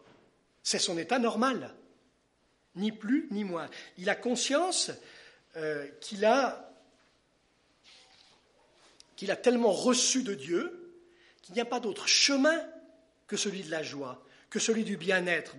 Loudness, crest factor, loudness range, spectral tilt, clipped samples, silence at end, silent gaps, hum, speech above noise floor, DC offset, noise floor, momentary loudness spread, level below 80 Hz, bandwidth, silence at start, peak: -29 LUFS; 20 dB; 6 LU; -2.5 dB/octave; under 0.1%; 0 s; none; none; 41 dB; under 0.1%; -71 dBFS; 16 LU; -80 dBFS; 11.5 kHz; 0.65 s; -12 dBFS